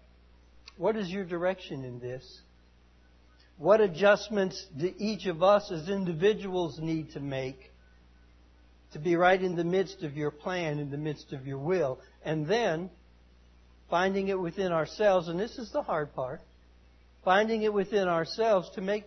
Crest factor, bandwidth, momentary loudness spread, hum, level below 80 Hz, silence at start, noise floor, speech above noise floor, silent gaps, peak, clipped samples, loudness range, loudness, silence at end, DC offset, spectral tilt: 20 dB; 6.4 kHz; 13 LU; 60 Hz at -60 dBFS; -60 dBFS; 0.8 s; -60 dBFS; 31 dB; none; -10 dBFS; under 0.1%; 5 LU; -29 LUFS; 0 s; under 0.1%; -6 dB/octave